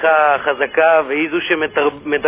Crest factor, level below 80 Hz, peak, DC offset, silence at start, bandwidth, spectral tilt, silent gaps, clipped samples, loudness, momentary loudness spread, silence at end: 14 dB; -54 dBFS; -2 dBFS; under 0.1%; 0 s; 3.8 kHz; -7.5 dB/octave; none; under 0.1%; -15 LUFS; 5 LU; 0 s